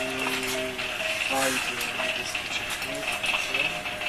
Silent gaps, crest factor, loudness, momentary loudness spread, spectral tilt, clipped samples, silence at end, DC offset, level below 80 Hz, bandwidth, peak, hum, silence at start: none; 16 dB; -26 LUFS; 4 LU; -1.5 dB/octave; under 0.1%; 0 s; under 0.1%; -54 dBFS; 14 kHz; -12 dBFS; none; 0 s